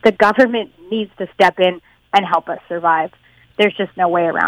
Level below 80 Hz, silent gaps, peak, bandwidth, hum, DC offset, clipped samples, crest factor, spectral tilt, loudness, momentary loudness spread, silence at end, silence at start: -58 dBFS; none; -2 dBFS; 15 kHz; none; under 0.1%; under 0.1%; 16 dB; -5.5 dB/octave; -17 LUFS; 12 LU; 0 s; 0.05 s